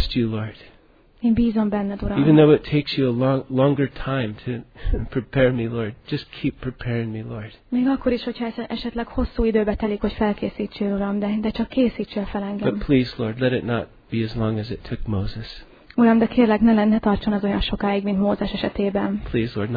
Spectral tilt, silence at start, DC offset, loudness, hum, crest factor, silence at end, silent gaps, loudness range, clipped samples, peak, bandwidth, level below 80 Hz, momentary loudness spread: -9.5 dB/octave; 0 s; under 0.1%; -22 LUFS; none; 18 dB; 0 s; none; 6 LU; under 0.1%; -2 dBFS; 5 kHz; -36 dBFS; 13 LU